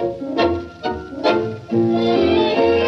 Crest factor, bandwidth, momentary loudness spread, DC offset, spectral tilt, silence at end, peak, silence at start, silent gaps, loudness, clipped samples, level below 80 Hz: 12 dB; 6.4 kHz; 10 LU; under 0.1%; -7 dB/octave; 0 s; -6 dBFS; 0 s; none; -19 LUFS; under 0.1%; -44 dBFS